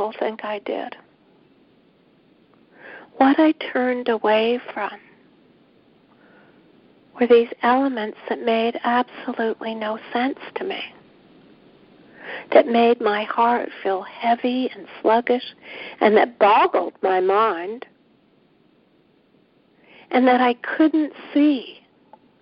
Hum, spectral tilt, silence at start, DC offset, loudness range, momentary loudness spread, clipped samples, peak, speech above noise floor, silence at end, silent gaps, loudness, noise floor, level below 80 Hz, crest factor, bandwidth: none; -9 dB/octave; 0 s; under 0.1%; 6 LU; 14 LU; under 0.1%; 0 dBFS; 39 dB; 0.7 s; none; -20 LUFS; -59 dBFS; -70 dBFS; 22 dB; 5.4 kHz